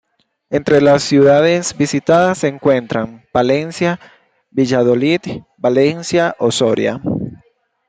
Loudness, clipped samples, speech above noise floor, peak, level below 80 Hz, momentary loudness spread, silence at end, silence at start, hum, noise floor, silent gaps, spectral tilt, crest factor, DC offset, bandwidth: -15 LUFS; under 0.1%; 41 dB; -2 dBFS; -52 dBFS; 11 LU; 0.55 s; 0.5 s; none; -55 dBFS; none; -5.5 dB/octave; 14 dB; under 0.1%; 9.4 kHz